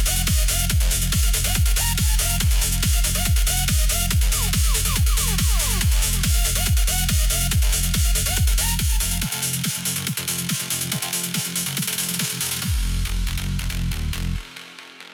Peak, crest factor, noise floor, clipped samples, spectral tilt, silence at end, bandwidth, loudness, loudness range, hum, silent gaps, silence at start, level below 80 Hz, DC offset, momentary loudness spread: -6 dBFS; 14 dB; -41 dBFS; under 0.1%; -2.5 dB/octave; 0 s; 19 kHz; -21 LUFS; 4 LU; none; none; 0 s; -24 dBFS; under 0.1%; 6 LU